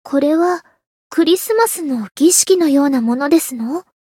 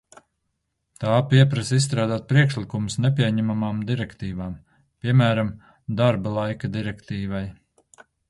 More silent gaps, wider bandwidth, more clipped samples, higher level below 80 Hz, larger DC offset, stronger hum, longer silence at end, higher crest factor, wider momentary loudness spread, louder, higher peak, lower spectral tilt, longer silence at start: first, 0.86-1.10 s vs none; first, 17 kHz vs 11.5 kHz; neither; second, -68 dBFS vs -50 dBFS; neither; neither; second, 0.2 s vs 0.8 s; about the same, 16 dB vs 20 dB; about the same, 11 LU vs 13 LU; first, -15 LUFS vs -23 LUFS; first, 0 dBFS vs -4 dBFS; second, -2.5 dB/octave vs -6.5 dB/octave; second, 0.05 s vs 1 s